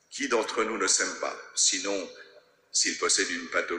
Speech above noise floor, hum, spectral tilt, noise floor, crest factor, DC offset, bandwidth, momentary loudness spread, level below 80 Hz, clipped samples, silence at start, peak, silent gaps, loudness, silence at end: 28 dB; none; 0.5 dB/octave; -56 dBFS; 18 dB; under 0.1%; 12 kHz; 9 LU; -68 dBFS; under 0.1%; 0.1 s; -10 dBFS; none; -26 LUFS; 0 s